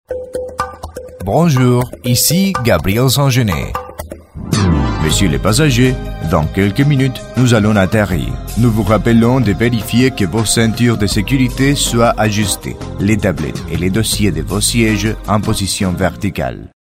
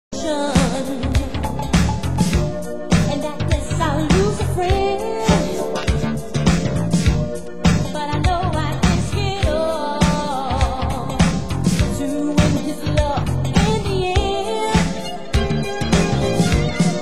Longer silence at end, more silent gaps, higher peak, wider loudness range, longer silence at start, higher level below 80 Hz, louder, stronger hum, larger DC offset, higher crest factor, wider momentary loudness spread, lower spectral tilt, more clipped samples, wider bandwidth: first, 0.3 s vs 0 s; neither; about the same, 0 dBFS vs -2 dBFS; about the same, 2 LU vs 1 LU; about the same, 0.1 s vs 0.1 s; about the same, -28 dBFS vs -26 dBFS; first, -14 LUFS vs -19 LUFS; neither; second, under 0.1% vs 3%; about the same, 14 dB vs 16 dB; first, 11 LU vs 5 LU; about the same, -5 dB/octave vs -5.5 dB/octave; neither; about the same, 16.5 kHz vs 16 kHz